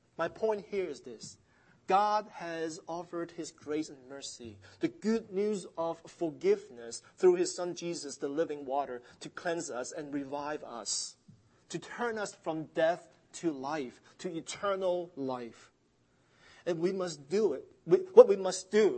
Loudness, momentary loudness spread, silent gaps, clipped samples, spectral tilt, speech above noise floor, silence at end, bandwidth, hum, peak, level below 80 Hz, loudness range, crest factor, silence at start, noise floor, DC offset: -32 LUFS; 16 LU; none; under 0.1%; -4.5 dB/octave; 38 dB; 0 s; 8.8 kHz; none; -6 dBFS; -76 dBFS; 5 LU; 28 dB; 0.2 s; -71 dBFS; under 0.1%